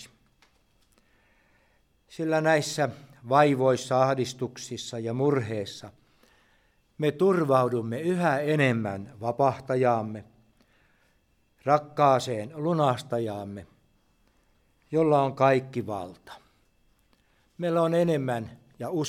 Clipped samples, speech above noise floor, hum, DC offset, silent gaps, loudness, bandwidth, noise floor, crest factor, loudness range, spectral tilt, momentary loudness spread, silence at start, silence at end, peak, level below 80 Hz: under 0.1%; 42 dB; none; under 0.1%; none; -26 LUFS; 16 kHz; -67 dBFS; 22 dB; 4 LU; -6 dB/octave; 14 LU; 0 s; 0 s; -6 dBFS; -68 dBFS